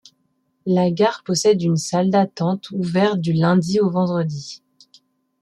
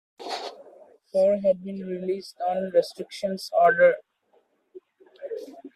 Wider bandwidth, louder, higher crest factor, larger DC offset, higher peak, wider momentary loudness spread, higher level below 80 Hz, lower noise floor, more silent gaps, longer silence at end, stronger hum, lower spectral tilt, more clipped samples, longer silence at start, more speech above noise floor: about the same, 12 kHz vs 13 kHz; first, -19 LUFS vs -25 LUFS; about the same, 16 dB vs 18 dB; neither; first, -4 dBFS vs -8 dBFS; second, 9 LU vs 17 LU; first, -62 dBFS vs -72 dBFS; about the same, -68 dBFS vs -66 dBFS; neither; first, 0.85 s vs 0.05 s; neither; about the same, -6 dB/octave vs -5 dB/octave; neither; first, 0.65 s vs 0.2 s; first, 49 dB vs 43 dB